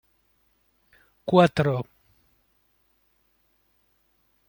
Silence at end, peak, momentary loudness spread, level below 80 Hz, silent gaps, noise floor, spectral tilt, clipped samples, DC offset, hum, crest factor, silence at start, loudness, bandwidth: 2.65 s; -4 dBFS; 20 LU; -60 dBFS; none; -68 dBFS; -7.5 dB/octave; under 0.1%; under 0.1%; none; 26 dB; 1.25 s; -22 LUFS; 17 kHz